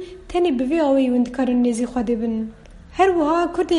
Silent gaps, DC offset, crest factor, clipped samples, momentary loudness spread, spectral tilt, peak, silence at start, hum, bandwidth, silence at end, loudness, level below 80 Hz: none; under 0.1%; 16 dB; under 0.1%; 9 LU; -5.5 dB/octave; -4 dBFS; 0 s; none; 11.5 kHz; 0 s; -20 LUFS; -44 dBFS